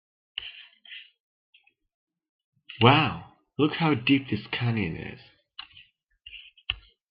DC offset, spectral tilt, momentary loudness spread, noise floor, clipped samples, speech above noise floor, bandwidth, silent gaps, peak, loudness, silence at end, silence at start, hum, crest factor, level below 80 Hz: under 0.1%; -9.5 dB/octave; 24 LU; -57 dBFS; under 0.1%; 33 dB; 5.4 kHz; 1.20-1.53 s, 1.94-2.07 s, 2.29-2.53 s; -4 dBFS; -25 LUFS; 0.3 s; 0.4 s; none; 24 dB; -58 dBFS